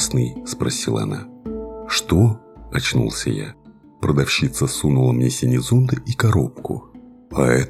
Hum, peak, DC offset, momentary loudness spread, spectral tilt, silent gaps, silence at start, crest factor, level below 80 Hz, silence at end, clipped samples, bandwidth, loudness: none; 0 dBFS; under 0.1%; 13 LU; -5 dB/octave; none; 0 s; 20 dB; -40 dBFS; 0 s; under 0.1%; 14.5 kHz; -20 LUFS